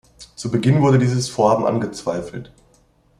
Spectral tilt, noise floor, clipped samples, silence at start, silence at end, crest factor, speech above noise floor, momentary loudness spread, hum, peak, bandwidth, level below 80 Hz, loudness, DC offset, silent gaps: -6.5 dB/octave; -57 dBFS; under 0.1%; 0.2 s; 0.75 s; 18 dB; 39 dB; 15 LU; none; -2 dBFS; 11.5 kHz; -52 dBFS; -18 LUFS; under 0.1%; none